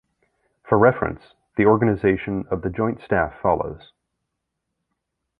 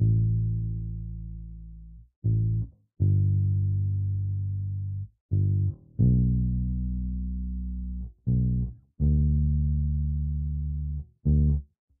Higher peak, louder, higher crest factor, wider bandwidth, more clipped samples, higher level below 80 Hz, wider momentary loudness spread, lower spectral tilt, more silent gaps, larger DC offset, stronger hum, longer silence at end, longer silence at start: first, -2 dBFS vs -12 dBFS; first, -21 LUFS vs -28 LUFS; first, 20 dB vs 14 dB; first, 4.7 kHz vs 0.8 kHz; neither; second, -46 dBFS vs -32 dBFS; about the same, 13 LU vs 12 LU; second, -11 dB/octave vs -20 dB/octave; second, none vs 2.16-2.22 s, 5.21-5.29 s; neither; neither; first, 1.65 s vs 0.35 s; first, 0.65 s vs 0 s